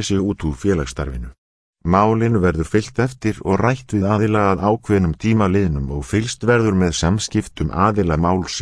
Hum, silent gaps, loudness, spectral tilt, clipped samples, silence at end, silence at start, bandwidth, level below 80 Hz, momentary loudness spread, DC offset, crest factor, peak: none; 1.38-1.73 s; -18 LUFS; -6 dB/octave; under 0.1%; 0 s; 0 s; 11 kHz; -34 dBFS; 7 LU; under 0.1%; 16 dB; -2 dBFS